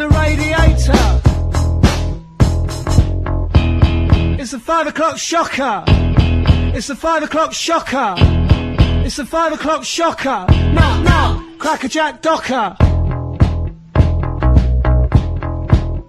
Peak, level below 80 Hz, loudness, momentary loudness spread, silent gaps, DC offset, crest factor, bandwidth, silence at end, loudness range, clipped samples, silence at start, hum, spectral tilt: 0 dBFS; -18 dBFS; -15 LUFS; 6 LU; none; under 0.1%; 14 dB; 13 kHz; 0.05 s; 1 LU; under 0.1%; 0 s; none; -6 dB/octave